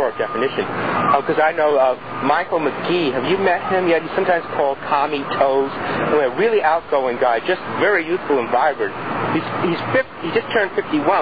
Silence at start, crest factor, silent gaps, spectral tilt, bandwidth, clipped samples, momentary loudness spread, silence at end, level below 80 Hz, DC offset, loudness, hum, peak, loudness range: 0 s; 16 dB; none; -8 dB/octave; 5 kHz; under 0.1%; 5 LU; 0 s; -56 dBFS; 0.6%; -19 LUFS; none; -2 dBFS; 1 LU